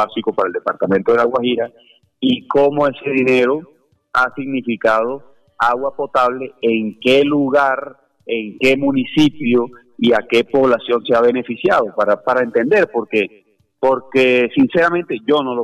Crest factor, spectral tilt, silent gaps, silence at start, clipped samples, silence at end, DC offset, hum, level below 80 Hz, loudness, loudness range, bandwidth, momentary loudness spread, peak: 12 dB; -6 dB/octave; none; 0 s; under 0.1%; 0 s; under 0.1%; none; -56 dBFS; -16 LUFS; 2 LU; 12 kHz; 7 LU; -4 dBFS